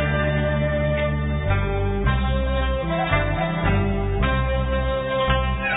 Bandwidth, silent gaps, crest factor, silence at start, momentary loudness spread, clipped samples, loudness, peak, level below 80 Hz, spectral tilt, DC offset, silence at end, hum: 4 kHz; none; 16 dB; 0 s; 2 LU; under 0.1%; -22 LUFS; -6 dBFS; -26 dBFS; -11.5 dB/octave; under 0.1%; 0 s; none